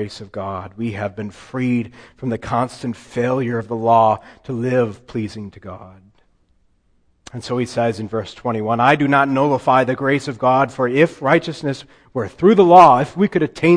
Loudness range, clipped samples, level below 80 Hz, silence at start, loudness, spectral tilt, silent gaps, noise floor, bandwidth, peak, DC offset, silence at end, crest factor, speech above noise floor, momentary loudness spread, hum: 12 LU; under 0.1%; -54 dBFS; 0 s; -17 LUFS; -7 dB/octave; none; -60 dBFS; 10.5 kHz; 0 dBFS; under 0.1%; 0 s; 18 dB; 42 dB; 15 LU; none